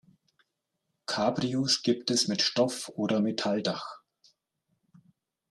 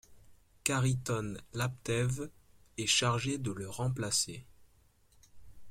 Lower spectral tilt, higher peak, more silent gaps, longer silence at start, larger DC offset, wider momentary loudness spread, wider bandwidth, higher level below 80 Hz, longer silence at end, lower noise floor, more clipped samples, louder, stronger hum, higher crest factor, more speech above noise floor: about the same, -4 dB/octave vs -3.5 dB/octave; about the same, -12 dBFS vs -12 dBFS; neither; first, 1.1 s vs 0.1 s; neither; second, 9 LU vs 12 LU; second, 13 kHz vs 16 kHz; second, -72 dBFS vs -60 dBFS; first, 1.55 s vs 0 s; first, -82 dBFS vs -66 dBFS; neither; first, -28 LUFS vs -33 LUFS; neither; about the same, 20 dB vs 24 dB; first, 54 dB vs 33 dB